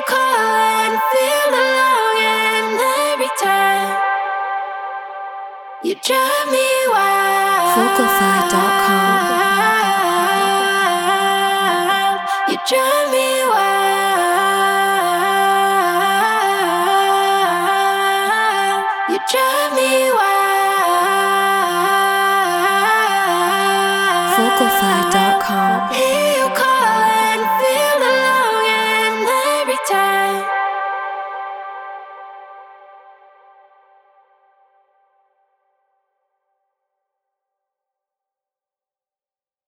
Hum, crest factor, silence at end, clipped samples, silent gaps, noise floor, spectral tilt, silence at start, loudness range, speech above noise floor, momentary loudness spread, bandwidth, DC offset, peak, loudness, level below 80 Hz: none; 16 dB; 6.95 s; under 0.1%; none; under -90 dBFS; -2 dB/octave; 0 s; 5 LU; over 75 dB; 6 LU; over 20 kHz; under 0.1%; 0 dBFS; -15 LUFS; -62 dBFS